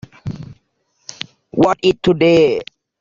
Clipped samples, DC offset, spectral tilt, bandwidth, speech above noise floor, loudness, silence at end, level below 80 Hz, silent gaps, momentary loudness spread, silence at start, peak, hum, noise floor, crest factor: under 0.1%; under 0.1%; -6 dB/octave; 7.6 kHz; 51 dB; -15 LUFS; 0.35 s; -48 dBFS; none; 23 LU; 0.25 s; 0 dBFS; none; -64 dBFS; 16 dB